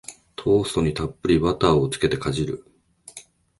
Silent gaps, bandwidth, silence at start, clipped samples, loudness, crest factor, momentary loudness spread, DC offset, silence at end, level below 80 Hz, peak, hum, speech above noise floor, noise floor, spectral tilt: none; 11.5 kHz; 0.1 s; under 0.1%; -22 LUFS; 18 dB; 22 LU; under 0.1%; 0.4 s; -42 dBFS; -4 dBFS; none; 26 dB; -47 dBFS; -6 dB/octave